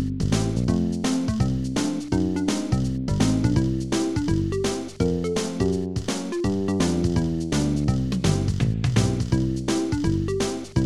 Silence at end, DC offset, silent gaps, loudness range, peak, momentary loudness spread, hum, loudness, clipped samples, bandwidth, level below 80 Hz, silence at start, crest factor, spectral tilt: 0 s; 0.6%; none; 1 LU; -8 dBFS; 4 LU; none; -24 LUFS; under 0.1%; 13 kHz; -36 dBFS; 0 s; 16 dB; -6 dB/octave